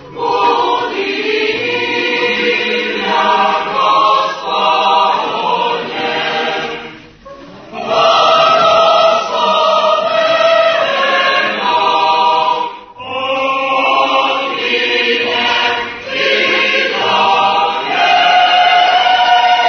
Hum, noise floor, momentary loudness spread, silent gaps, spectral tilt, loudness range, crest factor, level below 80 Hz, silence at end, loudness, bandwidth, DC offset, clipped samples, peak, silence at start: none; -35 dBFS; 8 LU; none; -2.5 dB/octave; 4 LU; 12 dB; -54 dBFS; 0 s; -12 LUFS; 6.6 kHz; under 0.1%; under 0.1%; 0 dBFS; 0 s